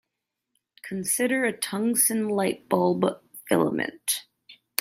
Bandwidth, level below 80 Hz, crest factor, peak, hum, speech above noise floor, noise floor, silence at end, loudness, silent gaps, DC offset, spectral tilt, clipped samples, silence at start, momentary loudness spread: 16 kHz; -72 dBFS; 22 dB; -4 dBFS; none; 58 dB; -83 dBFS; 0.25 s; -25 LUFS; none; under 0.1%; -3.5 dB/octave; under 0.1%; 0.85 s; 10 LU